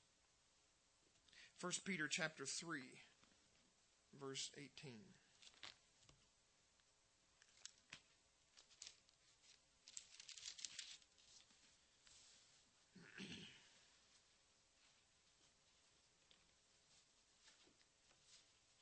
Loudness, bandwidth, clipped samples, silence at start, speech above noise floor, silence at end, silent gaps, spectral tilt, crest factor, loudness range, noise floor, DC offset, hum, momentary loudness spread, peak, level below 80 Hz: -52 LUFS; 8.4 kHz; under 0.1%; 1.15 s; 29 dB; 0.05 s; none; -2 dB/octave; 32 dB; 15 LU; -79 dBFS; under 0.1%; none; 23 LU; -28 dBFS; -90 dBFS